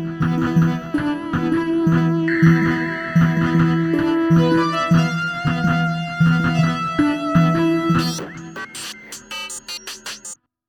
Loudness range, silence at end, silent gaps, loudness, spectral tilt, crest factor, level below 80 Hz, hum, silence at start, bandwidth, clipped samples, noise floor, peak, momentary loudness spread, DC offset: 4 LU; 0.35 s; none; -18 LUFS; -6.5 dB/octave; 16 dB; -46 dBFS; none; 0 s; 13 kHz; under 0.1%; -39 dBFS; -4 dBFS; 14 LU; under 0.1%